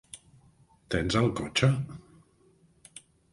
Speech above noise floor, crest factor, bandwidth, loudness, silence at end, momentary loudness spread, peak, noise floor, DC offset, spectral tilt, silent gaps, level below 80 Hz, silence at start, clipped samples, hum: 36 dB; 22 dB; 11.5 kHz; -28 LUFS; 0.35 s; 24 LU; -8 dBFS; -63 dBFS; under 0.1%; -5.5 dB/octave; none; -50 dBFS; 0.15 s; under 0.1%; none